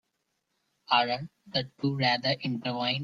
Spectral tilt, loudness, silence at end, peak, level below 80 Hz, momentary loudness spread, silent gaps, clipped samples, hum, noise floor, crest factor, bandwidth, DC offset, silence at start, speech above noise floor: -6 dB/octave; -28 LUFS; 0 s; -10 dBFS; -70 dBFS; 7 LU; none; under 0.1%; none; -79 dBFS; 22 dB; 7.2 kHz; under 0.1%; 0.9 s; 50 dB